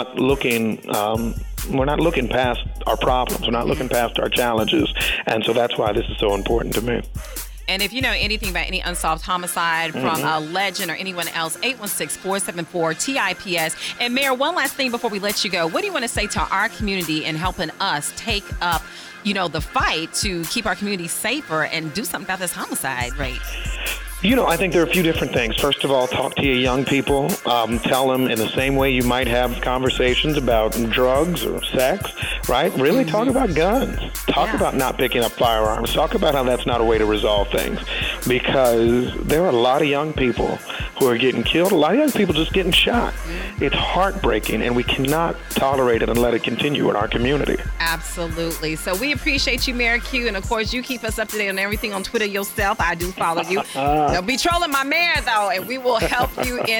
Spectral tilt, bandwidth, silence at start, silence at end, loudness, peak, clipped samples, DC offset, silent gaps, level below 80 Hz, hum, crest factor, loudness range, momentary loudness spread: -4 dB/octave; 19.5 kHz; 0 s; 0 s; -20 LUFS; -6 dBFS; under 0.1%; under 0.1%; none; -32 dBFS; none; 14 dB; 4 LU; 6 LU